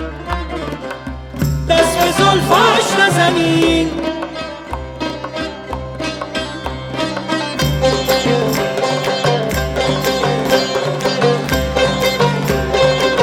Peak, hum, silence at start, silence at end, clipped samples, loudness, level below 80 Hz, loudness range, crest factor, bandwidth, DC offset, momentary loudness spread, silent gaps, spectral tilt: -2 dBFS; none; 0 s; 0 s; under 0.1%; -16 LUFS; -32 dBFS; 8 LU; 14 dB; 17.5 kHz; under 0.1%; 13 LU; none; -4.5 dB/octave